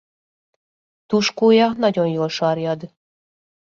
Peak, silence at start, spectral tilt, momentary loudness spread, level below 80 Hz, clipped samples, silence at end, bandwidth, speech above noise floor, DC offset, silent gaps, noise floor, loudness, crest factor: -4 dBFS; 1.1 s; -5.5 dB/octave; 9 LU; -64 dBFS; under 0.1%; 0.9 s; 7.4 kHz; over 72 dB; under 0.1%; none; under -90 dBFS; -18 LUFS; 16 dB